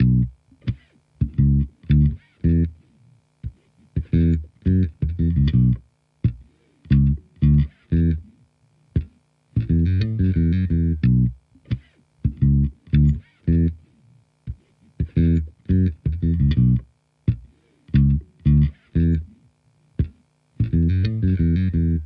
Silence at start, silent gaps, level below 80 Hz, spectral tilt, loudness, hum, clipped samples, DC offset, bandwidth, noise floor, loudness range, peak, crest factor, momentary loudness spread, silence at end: 0 s; none; -30 dBFS; -11 dB/octave; -21 LUFS; none; under 0.1%; under 0.1%; 5 kHz; -60 dBFS; 2 LU; -6 dBFS; 14 dB; 12 LU; 0 s